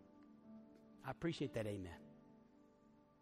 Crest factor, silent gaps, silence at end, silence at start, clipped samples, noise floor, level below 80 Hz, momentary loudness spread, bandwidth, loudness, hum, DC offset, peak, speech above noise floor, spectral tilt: 18 dB; none; 0.2 s; 0 s; under 0.1%; -70 dBFS; -74 dBFS; 24 LU; 14 kHz; -46 LUFS; none; under 0.1%; -32 dBFS; 25 dB; -6.5 dB/octave